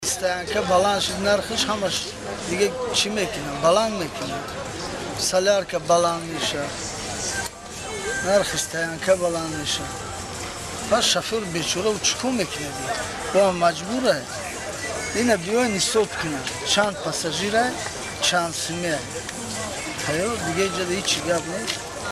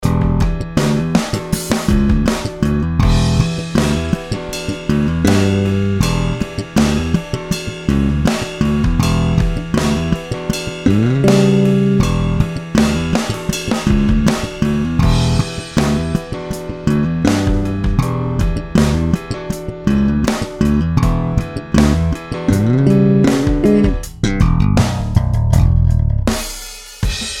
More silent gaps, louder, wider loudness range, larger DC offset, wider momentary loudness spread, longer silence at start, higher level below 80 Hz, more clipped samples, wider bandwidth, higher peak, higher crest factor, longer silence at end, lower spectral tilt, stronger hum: neither; second, -23 LUFS vs -16 LUFS; about the same, 2 LU vs 3 LU; neither; about the same, 10 LU vs 8 LU; about the same, 0 s vs 0 s; second, -48 dBFS vs -22 dBFS; neither; second, 14.5 kHz vs 16.5 kHz; second, -4 dBFS vs 0 dBFS; first, 20 dB vs 14 dB; about the same, 0 s vs 0 s; second, -2.5 dB/octave vs -6.5 dB/octave; neither